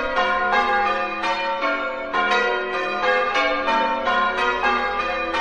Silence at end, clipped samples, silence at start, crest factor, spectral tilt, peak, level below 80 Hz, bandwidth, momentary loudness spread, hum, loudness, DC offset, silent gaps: 0 s; under 0.1%; 0 s; 16 dB; -3 dB/octave; -6 dBFS; -48 dBFS; 9.8 kHz; 4 LU; none; -20 LUFS; 0.5%; none